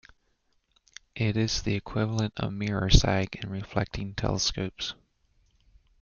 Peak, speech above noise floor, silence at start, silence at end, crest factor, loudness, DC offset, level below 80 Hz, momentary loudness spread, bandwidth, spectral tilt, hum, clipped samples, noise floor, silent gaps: -4 dBFS; 44 dB; 1.15 s; 1.1 s; 26 dB; -28 LUFS; under 0.1%; -36 dBFS; 12 LU; 7.4 kHz; -4.5 dB/octave; none; under 0.1%; -71 dBFS; none